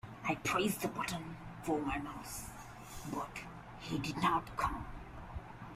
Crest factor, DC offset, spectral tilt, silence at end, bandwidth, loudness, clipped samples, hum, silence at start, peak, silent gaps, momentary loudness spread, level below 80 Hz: 20 dB; under 0.1%; -4.5 dB/octave; 0 s; 15.5 kHz; -39 LUFS; under 0.1%; none; 0.05 s; -20 dBFS; none; 15 LU; -54 dBFS